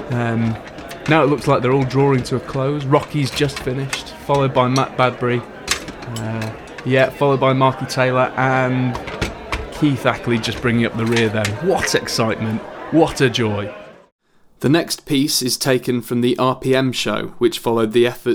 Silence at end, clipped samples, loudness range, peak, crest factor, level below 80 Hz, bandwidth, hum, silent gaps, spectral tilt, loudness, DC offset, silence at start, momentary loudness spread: 0 s; under 0.1%; 2 LU; -2 dBFS; 16 dB; -42 dBFS; 19 kHz; none; 14.12-14.19 s; -5 dB/octave; -18 LUFS; under 0.1%; 0 s; 9 LU